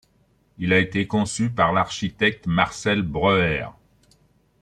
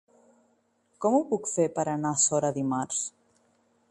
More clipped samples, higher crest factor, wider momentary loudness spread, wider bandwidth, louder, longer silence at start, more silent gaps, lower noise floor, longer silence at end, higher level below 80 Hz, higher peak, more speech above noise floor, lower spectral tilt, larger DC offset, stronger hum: neither; about the same, 20 dB vs 18 dB; about the same, 6 LU vs 7 LU; about the same, 11 kHz vs 11.5 kHz; first, -22 LUFS vs -27 LUFS; second, 0.6 s vs 1 s; neither; second, -62 dBFS vs -69 dBFS; about the same, 0.9 s vs 0.8 s; first, -48 dBFS vs -72 dBFS; first, -4 dBFS vs -12 dBFS; about the same, 41 dB vs 42 dB; about the same, -5 dB/octave vs -4.5 dB/octave; neither; neither